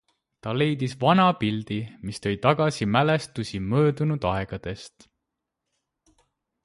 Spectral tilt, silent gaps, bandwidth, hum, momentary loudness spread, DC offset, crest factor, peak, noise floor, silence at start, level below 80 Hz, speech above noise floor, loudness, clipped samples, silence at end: -6.5 dB/octave; none; 11.5 kHz; none; 13 LU; under 0.1%; 20 dB; -6 dBFS; -83 dBFS; 0.45 s; -52 dBFS; 59 dB; -24 LUFS; under 0.1%; 1.75 s